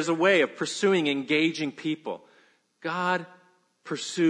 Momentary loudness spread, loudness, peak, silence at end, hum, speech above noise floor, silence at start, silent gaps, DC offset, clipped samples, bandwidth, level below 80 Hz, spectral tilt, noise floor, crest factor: 15 LU; -26 LUFS; -8 dBFS; 0 s; none; 37 dB; 0 s; none; under 0.1%; under 0.1%; 10 kHz; -82 dBFS; -4 dB/octave; -62 dBFS; 18 dB